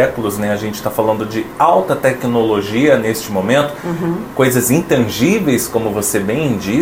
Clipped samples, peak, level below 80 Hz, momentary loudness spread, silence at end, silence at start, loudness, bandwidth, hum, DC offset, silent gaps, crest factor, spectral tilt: under 0.1%; 0 dBFS; -44 dBFS; 7 LU; 0 s; 0 s; -15 LUFS; 16.5 kHz; none; under 0.1%; none; 14 dB; -5 dB/octave